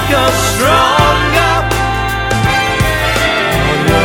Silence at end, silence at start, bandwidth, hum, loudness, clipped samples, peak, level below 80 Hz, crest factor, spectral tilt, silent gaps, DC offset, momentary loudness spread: 0 s; 0 s; 19 kHz; none; -11 LUFS; under 0.1%; 0 dBFS; -22 dBFS; 12 dB; -4 dB/octave; none; under 0.1%; 5 LU